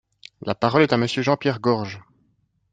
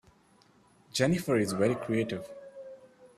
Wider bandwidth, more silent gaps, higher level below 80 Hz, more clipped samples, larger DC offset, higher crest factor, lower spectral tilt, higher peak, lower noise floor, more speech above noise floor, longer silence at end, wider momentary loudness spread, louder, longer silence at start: second, 9.2 kHz vs 15 kHz; neither; about the same, -62 dBFS vs -64 dBFS; neither; neither; about the same, 20 dB vs 20 dB; about the same, -6 dB/octave vs -5.5 dB/octave; first, -2 dBFS vs -12 dBFS; about the same, -66 dBFS vs -63 dBFS; first, 46 dB vs 34 dB; first, 0.75 s vs 0.1 s; second, 16 LU vs 20 LU; first, -21 LUFS vs -30 LUFS; second, 0.45 s vs 0.95 s